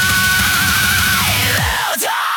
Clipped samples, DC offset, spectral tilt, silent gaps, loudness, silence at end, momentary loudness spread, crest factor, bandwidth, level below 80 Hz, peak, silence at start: under 0.1%; under 0.1%; -1.5 dB/octave; none; -13 LUFS; 0 s; 4 LU; 12 dB; 19 kHz; -34 dBFS; -2 dBFS; 0 s